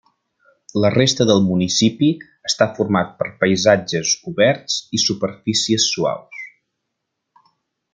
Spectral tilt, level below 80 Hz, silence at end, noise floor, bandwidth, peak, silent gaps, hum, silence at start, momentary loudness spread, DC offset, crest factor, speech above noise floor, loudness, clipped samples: -4 dB/octave; -60 dBFS; 1.45 s; -77 dBFS; 10 kHz; 0 dBFS; none; none; 0.75 s; 9 LU; under 0.1%; 18 dB; 60 dB; -18 LUFS; under 0.1%